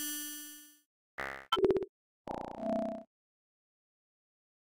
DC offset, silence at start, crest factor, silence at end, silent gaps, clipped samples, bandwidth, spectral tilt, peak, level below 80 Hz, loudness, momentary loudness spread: under 0.1%; 0 s; 22 dB; 1.55 s; 0.85-1.18 s, 1.89-2.25 s; under 0.1%; 16.5 kHz; -3.5 dB/octave; -18 dBFS; -64 dBFS; -36 LUFS; 18 LU